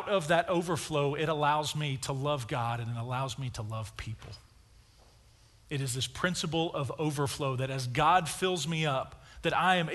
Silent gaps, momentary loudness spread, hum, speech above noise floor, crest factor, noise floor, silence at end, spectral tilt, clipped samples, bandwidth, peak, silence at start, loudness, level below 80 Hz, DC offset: none; 12 LU; none; 29 dB; 20 dB; -60 dBFS; 0 s; -4.5 dB/octave; under 0.1%; 12 kHz; -12 dBFS; 0 s; -31 LUFS; -56 dBFS; under 0.1%